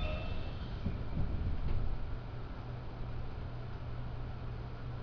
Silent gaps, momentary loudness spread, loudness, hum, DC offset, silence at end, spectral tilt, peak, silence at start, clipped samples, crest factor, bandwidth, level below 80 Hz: none; 6 LU; -42 LUFS; none; under 0.1%; 0 s; -8.5 dB/octave; -22 dBFS; 0 s; under 0.1%; 14 dB; 5.4 kHz; -40 dBFS